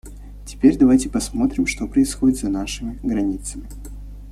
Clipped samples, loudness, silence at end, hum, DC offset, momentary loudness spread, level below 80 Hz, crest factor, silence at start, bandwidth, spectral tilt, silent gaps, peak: under 0.1%; -20 LUFS; 0 s; 50 Hz at -35 dBFS; under 0.1%; 22 LU; -34 dBFS; 18 dB; 0.05 s; 13.5 kHz; -5 dB/octave; none; -2 dBFS